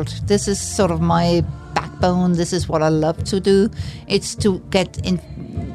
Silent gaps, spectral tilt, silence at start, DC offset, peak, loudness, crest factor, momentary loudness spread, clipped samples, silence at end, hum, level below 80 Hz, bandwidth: none; -5.5 dB/octave; 0 s; under 0.1%; -2 dBFS; -19 LUFS; 16 dB; 8 LU; under 0.1%; 0 s; none; -36 dBFS; 13.5 kHz